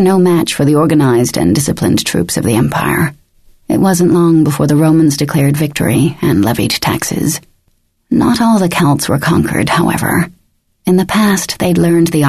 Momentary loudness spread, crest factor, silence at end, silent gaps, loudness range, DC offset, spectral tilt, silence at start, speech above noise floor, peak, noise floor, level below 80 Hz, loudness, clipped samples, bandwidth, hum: 5 LU; 10 dB; 0 s; none; 2 LU; under 0.1%; -5.5 dB/octave; 0 s; 47 dB; -2 dBFS; -58 dBFS; -38 dBFS; -12 LUFS; under 0.1%; 14 kHz; none